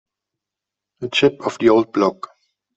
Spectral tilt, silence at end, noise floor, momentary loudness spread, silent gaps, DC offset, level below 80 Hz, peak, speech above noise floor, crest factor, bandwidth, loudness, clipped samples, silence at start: -5 dB/octave; 0.65 s; -85 dBFS; 19 LU; none; under 0.1%; -58 dBFS; -2 dBFS; 68 dB; 18 dB; 8 kHz; -18 LUFS; under 0.1%; 1 s